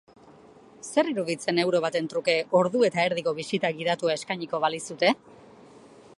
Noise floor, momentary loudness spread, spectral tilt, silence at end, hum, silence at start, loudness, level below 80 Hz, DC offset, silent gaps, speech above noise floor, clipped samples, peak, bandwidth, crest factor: -52 dBFS; 6 LU; -4.5 dB/octave; 0.4 s; none; 0.85 s; -26 LUFS; -74 dBFS; under 0.1%; none; 26 dB; under 0.1%; -8 dBFS; 11.5 kHz; 20 dB